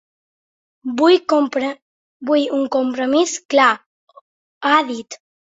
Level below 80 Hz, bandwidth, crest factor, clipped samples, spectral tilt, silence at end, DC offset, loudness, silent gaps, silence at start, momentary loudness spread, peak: -68 dBFS; 8 kHz; 18 dB; under 0.1%; -2 dB/octave; 0.45 s; under 0.1%; -17 LUFS; 1.82-2.20 s, 3.45-3.49 s, 3.86-4.07 s, 4.21-4.61 s; 0.85 s; 16 LU; -2 dBFS